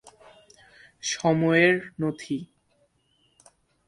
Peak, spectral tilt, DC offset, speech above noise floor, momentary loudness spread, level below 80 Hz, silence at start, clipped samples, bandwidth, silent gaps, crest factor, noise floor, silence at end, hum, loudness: -6 dBFS; -5 dB/octave; under 0.1%; 44 dB; 14 LU; -66 dBFS; 1.05 s; under 0.1%; 11.5 kHz; none; 22 dB; -68 dBFS; 1.4 s; none; -24 LUFS